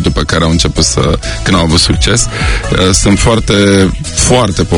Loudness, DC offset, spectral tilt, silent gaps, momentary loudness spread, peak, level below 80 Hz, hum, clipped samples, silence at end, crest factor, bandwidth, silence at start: -9 LUFS; under 0.1%; -4 dB/octave; none; 4 LU; 0 dBFS; -18 dBFS; none; 0.7%; 0 s; 10 dB; 17.5 kHz; 0 s